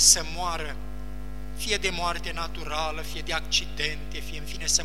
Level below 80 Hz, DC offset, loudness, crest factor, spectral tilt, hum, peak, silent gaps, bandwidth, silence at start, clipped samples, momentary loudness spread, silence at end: -38 dBFS; 2%; -27 LUFS; 22 dB; -1 dB/octave; none; -4 dBFS; none; 16 kHz; 0 s; under 0.1%; 15 LU; 0 s